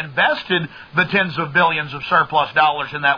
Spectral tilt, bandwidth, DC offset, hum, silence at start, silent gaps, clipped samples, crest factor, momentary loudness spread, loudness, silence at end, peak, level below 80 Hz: -6.5 dB/octave; 5.2 kHz; under 0.1%; none; 0 s; none; under 0.1%; 16 dB; 5 LU; -17 LUFS; 0 s; -2 dBFS; -56 dBFS